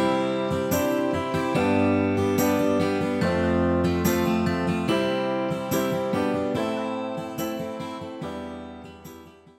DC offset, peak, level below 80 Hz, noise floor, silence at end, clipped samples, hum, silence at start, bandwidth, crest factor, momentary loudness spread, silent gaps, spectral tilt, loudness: under 0.1%; -10 dBFS; -50 dBFS; -46 dBFS; 0.25 s; under 0.1%; none; 0 s; 16 kHz; 16 dB; 12 LU; none; -6 dB/octave; -25 LUFS